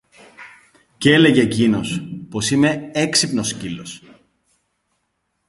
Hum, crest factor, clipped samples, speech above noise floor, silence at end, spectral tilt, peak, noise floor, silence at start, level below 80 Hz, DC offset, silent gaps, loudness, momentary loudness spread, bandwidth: none; 20 dB; under 0.1%; 54 dB; 1.5 s; -4 dB/octave; 0 dBFS; -72 dBFS; 0.4 s; -52 dBFS; under 0.1%; none; -17 LUFS; 17 LU; 11.5 kHz